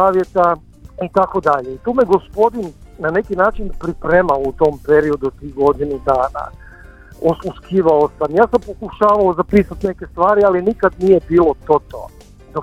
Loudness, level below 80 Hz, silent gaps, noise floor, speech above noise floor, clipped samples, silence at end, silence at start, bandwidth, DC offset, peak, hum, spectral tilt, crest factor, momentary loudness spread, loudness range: -16 LUFS; -36 dBFS; none; -39 dBFS; 24 dB; under 0.1%; 0 s; 0 s; 12 kHz; under 0.1%; 0 dBFS; none; -8 dB/octave; 16 dB; 11 LU; 3 LU